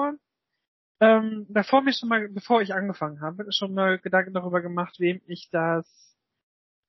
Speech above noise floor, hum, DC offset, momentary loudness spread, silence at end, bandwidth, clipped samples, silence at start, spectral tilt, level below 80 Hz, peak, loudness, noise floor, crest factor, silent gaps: 57 dB; none; under 0.1%; 11 LU; 1.05 s; 6 kHz; under 0.1%; 0 s; -3.5 dB/octave; -78 dBFS; -4 dBFS; -25 LUFS; -81 dBFS; 20 dB; 0.68-0.95 s